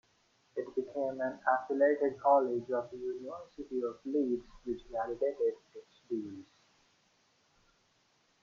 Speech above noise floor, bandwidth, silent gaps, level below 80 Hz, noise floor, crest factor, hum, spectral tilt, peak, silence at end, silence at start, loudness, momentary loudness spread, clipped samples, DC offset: 39 dB; 7.2 kHz; none; -68 dBFS; -72 dBFS; 20 dB; none; -7 dB/octave; -14 dBFS; 2 s; 0.55 s; -34 LUFS; 17 LU; under 0.1%; under 0.1%